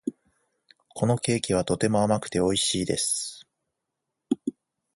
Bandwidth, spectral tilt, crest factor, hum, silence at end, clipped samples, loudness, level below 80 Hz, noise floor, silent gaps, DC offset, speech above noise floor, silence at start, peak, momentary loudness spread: 12 kHz; -4.5 dB/octave; 20 dB; none; 0.45 s; under 0.1%; -26 LUFS; -54 dBFS; -83 dBFS; none; under 0.1%; 58 dB; 0.05 s; -8 dBFS; 12 LU